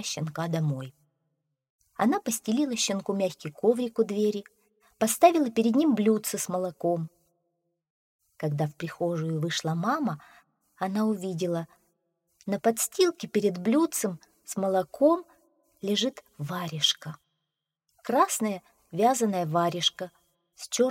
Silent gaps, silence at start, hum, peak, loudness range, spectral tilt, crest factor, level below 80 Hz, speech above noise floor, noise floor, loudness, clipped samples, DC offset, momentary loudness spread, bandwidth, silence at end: 1.70-1.79 s, 7.90-8.19 s; 0 s; none; -6 dBFS; 6 LU; -4.5 dB/octave; 22 dB; -74 dBFS; 58 dB; -85 dBFS; -27 LUFS; under 0.1%; under 0.1%; 13 LU; 16.5 kHz; 0 s